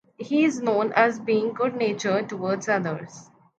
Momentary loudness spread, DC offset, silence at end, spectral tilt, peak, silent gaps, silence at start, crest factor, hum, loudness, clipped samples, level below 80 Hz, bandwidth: 7 LU; under 0.1%; 0.35 s; -5.5 dB/octave; -4 dBFS; none; 0.2 s; 20 dB; none; -24 LUFS; under 0.1%; -74 dBFS; 8.8 kHz